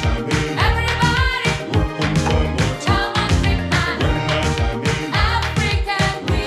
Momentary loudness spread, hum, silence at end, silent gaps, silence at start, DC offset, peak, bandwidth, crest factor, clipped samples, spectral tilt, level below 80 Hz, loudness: 3 LU; none; 0 s; none; 0 s; under 0.1%; -4 dBFS; 13.5 kHz; 14 dB; under 0.1%; -5 dB/octave; -26 dBFS; -18 LUFS